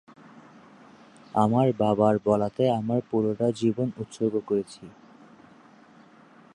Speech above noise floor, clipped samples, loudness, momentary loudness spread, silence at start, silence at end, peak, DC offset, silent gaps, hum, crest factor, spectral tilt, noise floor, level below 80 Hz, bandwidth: 29 dB; under 0.1%; -25 LUFS; 8 LU; 1.35 s; 1.65 s; -8 dBFS; under 0.1%; none; none; 20 dB; -8 dB/octave; -53 dBFS; -62 dBFS; 10.5 kHz